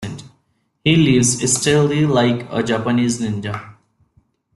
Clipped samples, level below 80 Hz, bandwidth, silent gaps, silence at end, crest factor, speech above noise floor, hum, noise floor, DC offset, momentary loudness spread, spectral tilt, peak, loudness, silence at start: under 0.1%; -50 dBFS; 12.5 kHz; none; 0.85 s; 16 dB; 49 dB; none; -65 dBFS; under 0.1%; 14 LU; -4.5 dB/octave; -2 dBFS; -17 LUFS; 0 s